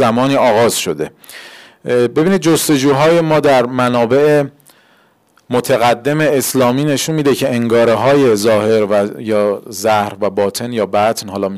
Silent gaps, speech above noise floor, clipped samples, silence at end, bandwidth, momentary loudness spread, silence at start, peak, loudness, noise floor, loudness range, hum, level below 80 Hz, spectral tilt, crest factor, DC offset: none; 40 dB; under 0.1%; 0 s; 16 kHz; 8 LU; 0 s; -6 dBFS; -13 LUFS; -53 dBFS; 2 LU; none; -54 dBFS; -5 dB/octave; 8 dB; under 0.1%